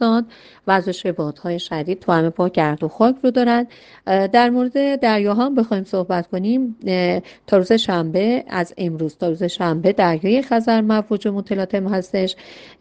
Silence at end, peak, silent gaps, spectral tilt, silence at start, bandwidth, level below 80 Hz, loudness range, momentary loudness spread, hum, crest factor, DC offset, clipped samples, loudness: 0.15 s; 0 dBFS; none; -7 dB/octave; 0 s; 9.2 kHz; -58 dBFS; 2 LU; 8 LU; none; 18 dB; under 0.1%; under 0.1%; -19 LUFS